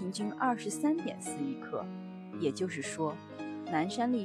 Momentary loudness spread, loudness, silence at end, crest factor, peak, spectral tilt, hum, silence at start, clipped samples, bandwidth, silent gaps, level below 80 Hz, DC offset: 11 LU; -35 LUFS; 0 s; 16 dB; -18 dBFS; -5 dB/octave; none; 0 s; under 0.1%; 13.5 kHz; none; -80 dBFS; under 0.1%